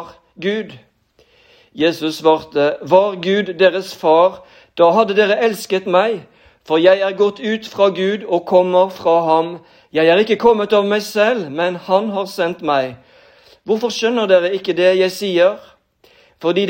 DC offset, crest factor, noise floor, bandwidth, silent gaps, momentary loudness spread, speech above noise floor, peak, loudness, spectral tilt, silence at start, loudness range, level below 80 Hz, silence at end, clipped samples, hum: under 0.1%; 16 dB; -55 dBFS; 16.5 kHz; none; 9 LU; 40 dB; 0 dBFS; -16 LUFS; -5 dB/octave; 0 s; 3 LU; -62 dBFS; 0 s; under 0.1%; none